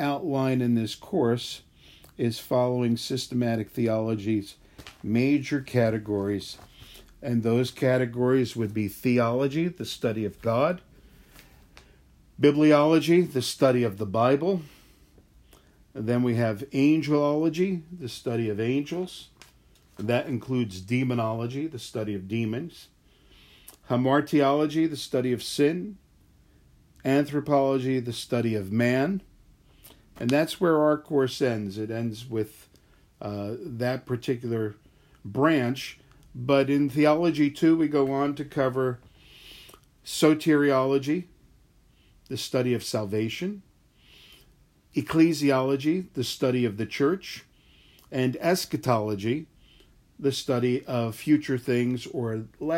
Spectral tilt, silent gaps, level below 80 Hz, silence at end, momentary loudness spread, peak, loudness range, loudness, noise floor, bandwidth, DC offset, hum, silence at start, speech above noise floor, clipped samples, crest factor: -6.5 dB/octave; none; -60 dBFS; 0 s; 12 LU; -8 dBFS; 6 LU; -26 LUFS; -60 dBFS; 16 kHz; under 0.1%; none; 0 s; 35 dB; under 0.1%; 20 dB